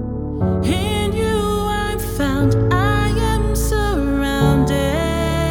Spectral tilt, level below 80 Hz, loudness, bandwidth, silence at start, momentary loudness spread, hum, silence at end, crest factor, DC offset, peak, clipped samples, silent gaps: -6 dB/octave; -24 dBFS; -18 LUFS; 19.5 kHz; 0 s; 5 LU; none; 0 s; 14 dB; under 0.1%; -4 dBFS; under 0.1%; none